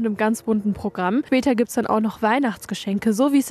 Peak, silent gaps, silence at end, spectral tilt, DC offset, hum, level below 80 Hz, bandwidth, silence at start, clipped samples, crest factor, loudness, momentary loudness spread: -8 dBFS; none; 0 s; -5.5 dB/octave; under 0.1%; none; -54 dBFS; 14 kHz; 0 s; under 0.1%; 14 dB; -21 LUFS; 6 LU